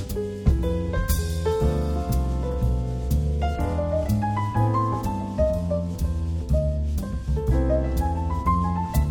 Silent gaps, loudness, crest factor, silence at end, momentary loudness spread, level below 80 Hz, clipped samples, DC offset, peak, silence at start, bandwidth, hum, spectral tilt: none; -25 LUFS; 16 dB; 0 s; 4 LU; -26 dBFS; under 0.1%; under 0.1%; -6 dBFS; 0 s; 19 kHz; none; -7.5 dB/octave